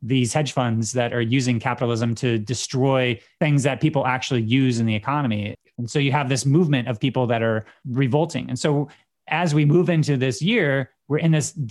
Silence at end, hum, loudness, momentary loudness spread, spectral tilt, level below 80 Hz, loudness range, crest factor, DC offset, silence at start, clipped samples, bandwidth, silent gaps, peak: 0 s; none; -21 LUFS; 6 LU; -6 dB/octave; -62 dBFS; 1 LU; 16 dB; under 0.1%; 0 s; under 0.1%; 12 kHz; none; -4 dBFS